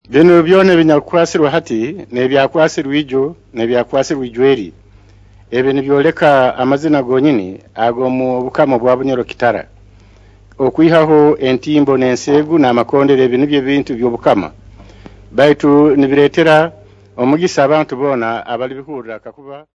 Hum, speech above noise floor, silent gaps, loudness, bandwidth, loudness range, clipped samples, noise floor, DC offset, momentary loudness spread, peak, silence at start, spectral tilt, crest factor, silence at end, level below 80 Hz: none; 31 dB; none; -12 LUFS; 8 kHz; 4 LU; 0.3%; -43 dBFS; under 0.1%; 11 LU; 0 dBFS; 0.1 s; -6.5 dB/octave; 12 dB; 0.2 s; -46 dBFS